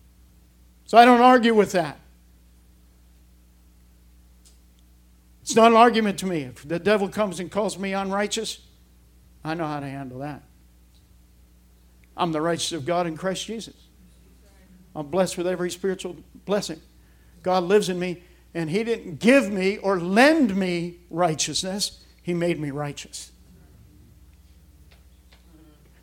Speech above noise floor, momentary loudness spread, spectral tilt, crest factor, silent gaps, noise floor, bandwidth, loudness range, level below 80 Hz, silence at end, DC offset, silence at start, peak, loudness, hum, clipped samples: 32 dB; 20 LU; -4.5 dB/octave; 24 dB; none; -54 dBFS; 16.5 kHz; 11 LU; -54 dBFS; 2.75 s; under 0.1%; 0.9 s; 0 dBFS; -22 LUFS; none; under 0.1%